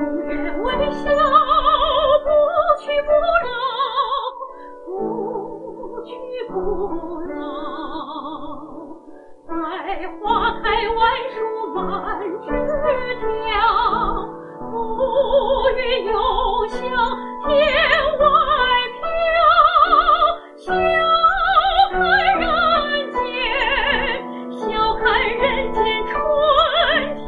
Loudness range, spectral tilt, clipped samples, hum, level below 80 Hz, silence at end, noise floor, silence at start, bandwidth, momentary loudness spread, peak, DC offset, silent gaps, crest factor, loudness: 12 LU; -5.5 dB/octave; under 0.1%; none; -36 dBFS; 0 s; -41 dBFS; 0 s; 7.4 kHz; 15 LU; -2 dBFS; under 0.1%; none; 18 dB; -18 LUFS